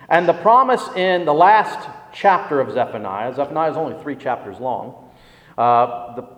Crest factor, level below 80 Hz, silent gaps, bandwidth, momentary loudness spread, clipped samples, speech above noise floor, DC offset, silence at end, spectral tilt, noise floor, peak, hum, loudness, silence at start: 18 dB; -62 dBFS; none; 11 kHz; 14 LU; under 0.1%; 29 dB; under 0.1%; 0.1 s; -6 dB/octave; -47 dBFS; 0 dBFS; 60 Hz at -55 dBFS; -18 LUFS; 0 s